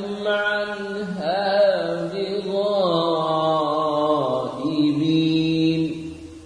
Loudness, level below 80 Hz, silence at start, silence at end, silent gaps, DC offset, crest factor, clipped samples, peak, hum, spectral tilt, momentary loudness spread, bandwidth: -22 LUFS; -56 dBFS; 0 s; 0 s; none; under 0.1%; 14 dB; under 0.1%; -6 dBFS; none; -6.5 dB/octave; 7 LU; 10.5 kHz